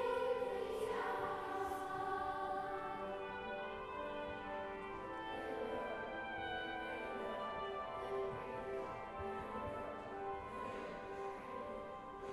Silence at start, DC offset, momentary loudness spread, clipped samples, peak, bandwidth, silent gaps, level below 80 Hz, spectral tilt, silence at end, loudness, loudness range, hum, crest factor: 0 s; under 0.1%; 6 LU; under 0.1%; -28 dBFS; 14.5 kHz; none; -64 dBFS; -5 dB/octave; 0 s; -44 LUFS; 4 LU; none; 16 dB